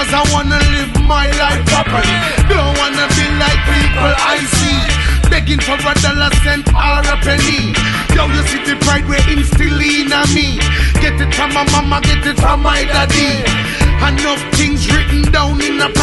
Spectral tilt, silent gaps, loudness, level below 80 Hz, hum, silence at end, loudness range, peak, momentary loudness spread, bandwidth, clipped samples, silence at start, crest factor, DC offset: -4 dB/octave; none; -12 LUFS; -16 dBFS; none; 0 s; 1 LU; 0 dBFS; 2 LU; 12 kHz; under 0.1%; 0 s; 12 dB; under 0.1%